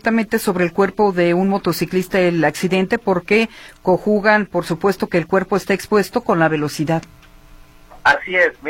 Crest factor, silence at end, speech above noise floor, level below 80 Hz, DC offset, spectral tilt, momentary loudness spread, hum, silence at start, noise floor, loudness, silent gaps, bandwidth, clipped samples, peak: 16 dB; 0 s; 26 dB; -48 dBFS; under 0.1%; -6 dB/octave; 5 LU; none; 0.05 s; -43 dBFS; -17 LUFS; none; 16.5 kHz; under 0.1%; -2 dBFS